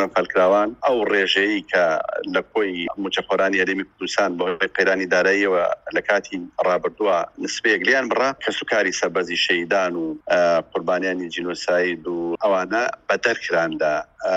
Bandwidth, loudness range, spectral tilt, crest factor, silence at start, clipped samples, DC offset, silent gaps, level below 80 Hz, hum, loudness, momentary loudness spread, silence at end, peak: 9 kHz; 2 LU; -3.5 dB/octave; 18 dB; 0 s; under 0.1%; under 0.1%; none; -60 dBFS; none; -21 LUFS; 7 LU; 0 s; -4 dBFS